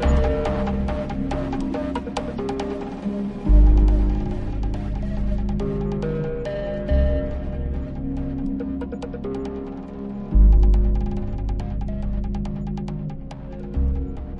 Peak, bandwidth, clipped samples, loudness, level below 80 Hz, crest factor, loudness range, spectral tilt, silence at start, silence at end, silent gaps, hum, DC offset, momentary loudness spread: -4 dBFS; 7 kHz; under 0.1%; -25 LUFS; -22 dBFS; 18 dB; 4 LU; -8.5 dB/octave; 0 s; 0 s; none; none; under 0.1%; 12 LU